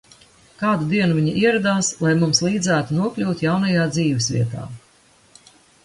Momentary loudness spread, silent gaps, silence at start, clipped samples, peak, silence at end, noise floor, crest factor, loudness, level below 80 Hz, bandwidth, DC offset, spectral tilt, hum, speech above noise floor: 6 LU; none; 0.6 s; under 0.1%; -4 dBFS; 1.05 s; -55 dBFS; 16 dB; -19 LUFS; -54 dBFS; 11.5 kHz; under 0.1%; -5 dB/octave; none; 35 dB